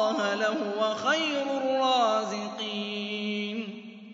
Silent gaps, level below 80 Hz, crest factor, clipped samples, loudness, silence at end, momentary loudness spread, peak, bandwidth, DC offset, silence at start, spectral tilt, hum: none; -82 dBFS; 16 dB; under 0.1%; -28 LUFS; 0 s; 9 LU; -12 dBFS; 7.8 kHz; under 0.1%; 0 s; -3.5 dB/octave; none